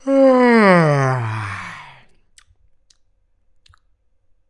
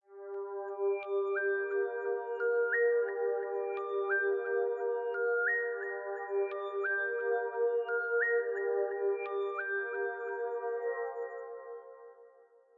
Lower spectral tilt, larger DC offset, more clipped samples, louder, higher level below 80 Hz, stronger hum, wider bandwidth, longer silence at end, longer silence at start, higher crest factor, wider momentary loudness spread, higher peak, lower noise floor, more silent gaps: first, -7.5 dB/octave vs 0.5 dB/octave; neither; neither; first, -14 LUFS vs -33 LUFS; first, -60 dBFS vs under -90 dBFS; neither; first, 11 kHz vs 3.9 kHz; first, 2.65 s vs 0.5 s; about the same, 0.05 s vs 0.1 s; about the same, 18 dB vs 14 dB; first, 20 LU vs 10 LU; first, 0 dBFS vs -20 dBFS; about the same, -60 dBFS vs -62 dBFS; neither